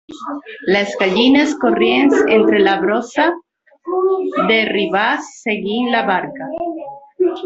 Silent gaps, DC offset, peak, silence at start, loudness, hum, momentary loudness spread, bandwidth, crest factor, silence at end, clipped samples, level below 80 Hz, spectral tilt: none; under 0.1%; -2 dBFS; 0.1 s; -16 LUFS; none; 14 LU; 8 kHz; 14 dB; 0 s; under 0.1%; -58 dBFS; -5 dB/octave